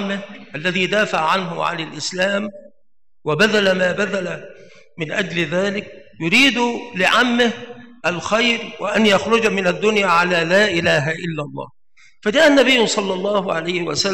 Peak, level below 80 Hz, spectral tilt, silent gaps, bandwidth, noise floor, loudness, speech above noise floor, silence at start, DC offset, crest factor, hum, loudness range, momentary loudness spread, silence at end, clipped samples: -4 dBFS; -58 dBFS; -4 dB/octave; none; 16 kHz; -72 dBFS; -17 LUFS; 54 dB; 0 s; 0.5%; 14 dB; none; 4 LU; 14 LU; 0 s; under 0.1%